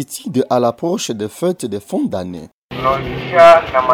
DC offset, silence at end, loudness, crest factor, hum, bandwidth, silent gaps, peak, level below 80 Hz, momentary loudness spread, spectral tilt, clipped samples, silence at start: under 0.1%; 0 s; -15 LUFS; 14 dB; none; 16 kHz; 2.53-2.69 s; 0 dBFS; -44 dBFS; 16 LU; -5 dB/octave; under 0.1%; 0 s